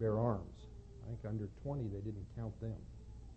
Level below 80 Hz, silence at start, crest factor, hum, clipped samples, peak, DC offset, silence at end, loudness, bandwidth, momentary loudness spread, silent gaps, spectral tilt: -54 dBFS; 0 s; 20 dB; none; under 0.1%; -20 dBFS; under 0.1%; 0 s; -43 LUFS; 8 kHz; 17 LU; none; -10 dB/octave